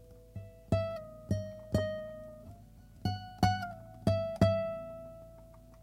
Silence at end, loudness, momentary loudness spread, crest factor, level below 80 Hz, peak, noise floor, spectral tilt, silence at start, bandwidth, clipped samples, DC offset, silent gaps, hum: 0 s; -34 LUFS; 22 LU; 22 dB; -52 dBFS; -12 dBFS; -55 dBFS; -7 dB/octave; 0 s; 15.5 kHz; under 0.1%; under 0.1%; none; none